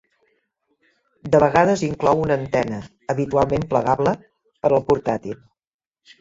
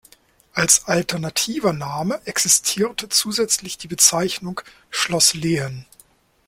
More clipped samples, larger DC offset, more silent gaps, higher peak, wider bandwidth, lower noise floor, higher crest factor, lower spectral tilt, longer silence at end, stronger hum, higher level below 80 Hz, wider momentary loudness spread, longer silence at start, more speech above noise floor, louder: neither; neither; neither; about the same, -2 dBFS vs 0 dBFS; second, 7.8 kHz vs 16.5 kHz; first, under -90 dBFS vs -55 dBFS; about the same, 20 dB vs 22 dB; first, -7 dB/octave vs -2 dB/octave; first, 0.85 s vs 0.65 s; neither; first, -48 dBFS vs -56 dBFS; about the same, 14 LU vs 14 LU; first, 1.25 s vs 0.55 s; first, over 71 dB vs 34 dB; about the same, -20 LUFS vs -18 LUFS